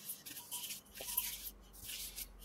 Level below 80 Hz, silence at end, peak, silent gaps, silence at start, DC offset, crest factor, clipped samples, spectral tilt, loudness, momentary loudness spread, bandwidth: -62 dBFS; 0 s; -20 dBFS; none; 0 s; under 0.1%; 28 dB; under 0.1%; 0 dB/octave; -43 LUFS; 9 LU; 16 kHz